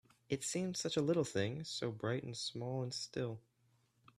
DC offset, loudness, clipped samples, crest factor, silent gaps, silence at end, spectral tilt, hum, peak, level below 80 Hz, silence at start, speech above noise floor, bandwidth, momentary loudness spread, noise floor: under 0.1%; -39 LUFS; under 0.1%; 18 dB; none; 0.8 s; -4.5 dB/octave; none; -22 dBFS; -74 dBFS; 0.3 s; 36 dB; 14 kHz; 8 LU; -75 dBFS